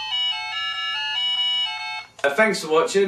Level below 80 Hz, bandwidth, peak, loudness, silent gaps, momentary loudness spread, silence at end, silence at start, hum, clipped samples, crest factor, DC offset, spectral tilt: -70 dBFS; 14 kHz; -4 dBFS; -22 LUFS; none; 6 LU; 0 s; 0 s; none; under 0.1%; 18 dB; under 0.1%; -2 dB/octave